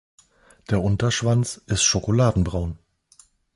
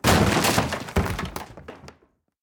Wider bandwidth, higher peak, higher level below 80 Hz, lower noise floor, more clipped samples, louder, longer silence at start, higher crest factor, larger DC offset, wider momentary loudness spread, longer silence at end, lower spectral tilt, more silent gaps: second, 11.5 kHz vs over 20 kHz; second, -8 dBFS vs -4 dBFS; about the same, -38 dBFS vs -36 dBFS; second, -56 dBFS vs -62 dBFS; neither; about the same, -22 LUFS vs -23 LUFS; first, 0.7 s vs 0.05 s; about the same, 16 dB vs 20 dB; neither; second, 9 LU vs 23 LU; first, 0.8 s vs 0.55 s; about the same, -4.5 dB/octave vs -4.5 dB/octave; neither